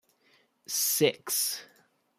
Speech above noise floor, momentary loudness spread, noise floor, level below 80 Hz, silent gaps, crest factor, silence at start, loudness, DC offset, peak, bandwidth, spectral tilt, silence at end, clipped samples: 38 dB; 8 LU; -67 dBFS; -82 dBFS; none; 22 dB; 0.7 s; -28 LUFS; under 0.1%; -10 dBFS; 15.5 kHz; -2 dB/octave; 0.55 s; under 0.1%